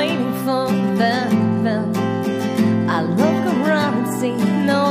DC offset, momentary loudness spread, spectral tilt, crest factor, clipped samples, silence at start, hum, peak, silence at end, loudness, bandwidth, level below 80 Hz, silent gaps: under 0.1%; 4 LU; -6.5 dB/octave; 14 dB; under 0.1%; 0 s; none; -4 dBFS; 0 s; -18 LUFS; 15.5 kHz; -60 dBFS; none